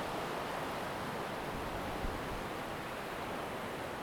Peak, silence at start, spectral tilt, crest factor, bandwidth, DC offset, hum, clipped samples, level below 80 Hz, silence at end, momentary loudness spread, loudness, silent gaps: -24 dBFS; 0 s; -4.5 dB/octave; 16 dB; over 20 kHz; under 0.1%; none; under 0.1%; -52 dBFS; 0 s; 2 LU; -40 LUFS; none